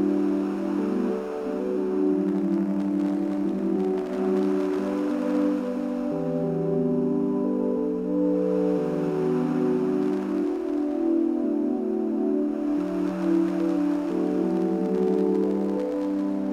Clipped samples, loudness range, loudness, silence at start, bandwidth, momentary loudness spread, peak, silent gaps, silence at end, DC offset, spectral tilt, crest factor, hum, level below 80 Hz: under 0.1%; 1 LU; -25 LUFS; 0 s; 9.8 kHz; 3 LU; -12 dBFS; none; 0 s; under 0.1%; -9 dB/octave; 12 dB; none; -60 dBFS